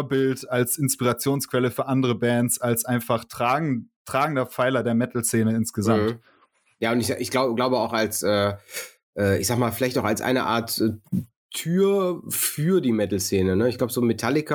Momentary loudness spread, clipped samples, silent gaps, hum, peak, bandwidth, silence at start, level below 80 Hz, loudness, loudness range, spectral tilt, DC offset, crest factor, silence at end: 6 LU; under 0.1%; 3.96-4.05 s, 9.03-9.13 s, 11.36-11.49 s; none; -6 dBFS; 19.5 kHz; 0 s; -60 dBFS; -23 LUFS; 1 LU; -5 dB/octave; under 0.1%; 16 dB; 0 s